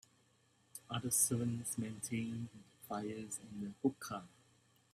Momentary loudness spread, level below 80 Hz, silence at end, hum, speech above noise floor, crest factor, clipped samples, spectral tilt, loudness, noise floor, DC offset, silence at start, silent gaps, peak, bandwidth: 17 LU; -76 dBFS; 0.65 s; none; 33 dB; 24 dB; under 0.1%; -4 dB/octave; -39 LUFS; -73 dBFS; under 0.1%; 0.75 s; none; -18 dBFS; 15.5 kHz